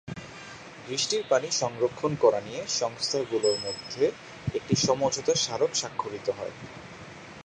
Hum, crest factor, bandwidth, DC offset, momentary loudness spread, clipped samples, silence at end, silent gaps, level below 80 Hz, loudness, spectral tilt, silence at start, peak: none; 20 dB; 10 kHz; under 0.1%; 18 LU; under 0.1%; 0 s; none; -60 dBFS; -27 LUFS; -3.5 dB/octave; 0.05 s; -8 dBFS